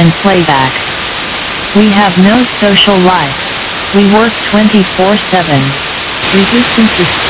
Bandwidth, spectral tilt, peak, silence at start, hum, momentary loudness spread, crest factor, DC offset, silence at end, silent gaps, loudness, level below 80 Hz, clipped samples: 4 kHz; -9.5 dB/octave; 0 dBFS; 0 s; none; 8 LU; 8 dB; under 0.1%; 0 s; none; -8 LUFS; -34 dBFS; 2%